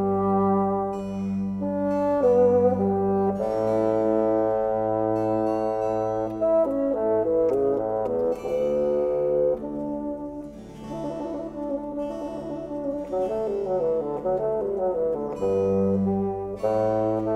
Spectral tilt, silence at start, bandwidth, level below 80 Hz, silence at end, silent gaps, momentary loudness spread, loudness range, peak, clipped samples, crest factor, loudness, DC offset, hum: -9.5 dB/octave; 0 s; 9.4 kHz; -52 dBFS; 0 s; none; 9 LU; 7 LU; -10 dBFS; under 0.1%; 14 dB; -25 LUFS; under 0.1%; none